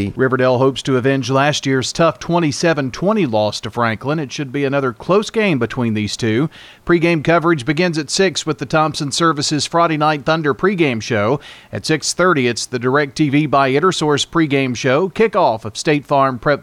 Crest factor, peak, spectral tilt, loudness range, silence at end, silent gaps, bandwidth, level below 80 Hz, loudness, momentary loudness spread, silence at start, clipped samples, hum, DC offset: 14 dB; -2 dBFS; -5 dB/octave; 2 LU; 0 s; none; 14.5 kHz; -48 dBFS; -16 LUFS; 5 LU; 0 s; under 0.1%; none; under 0.1%